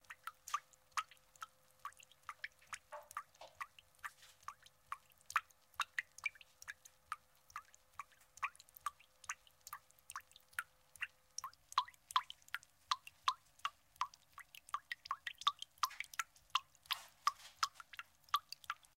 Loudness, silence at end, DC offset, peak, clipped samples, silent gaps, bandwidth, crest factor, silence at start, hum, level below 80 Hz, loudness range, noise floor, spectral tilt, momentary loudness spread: -45 LUFS; 0.25 s; under 0.1%; -18 dBFS; under 0.1%; none; 16 kHz; 30 dB; 0.1 s; none; -82 dBFS; 8 LU; -61 dBFS; 2 dB/octave; 15 LU